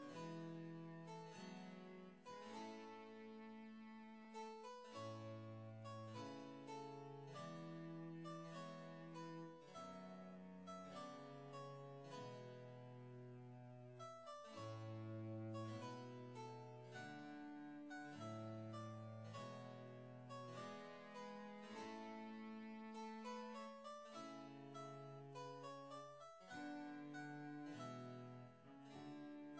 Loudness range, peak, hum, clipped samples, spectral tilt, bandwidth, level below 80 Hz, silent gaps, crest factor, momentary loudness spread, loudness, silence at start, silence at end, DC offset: 3 LU; -42 dBFS; none; under 0.1%; -6 dB/octave; 8 kHz; under -90 dBFS; none; 14 dB; 6 LU; -55 LUFS; 0 s; 0 s; under 0.1%